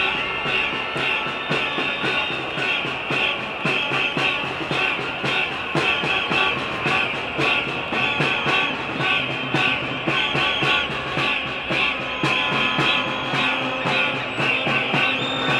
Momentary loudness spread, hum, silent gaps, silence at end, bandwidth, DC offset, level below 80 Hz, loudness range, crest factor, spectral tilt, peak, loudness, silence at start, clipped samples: 4 LU; none; none; 0 s; 14 kHz; under 0.1%; -50 dBFS; 2 LU; 16 dB; -4 dB/octave; -6 dBFS; -20 LUFS; 0 s; under 0.1%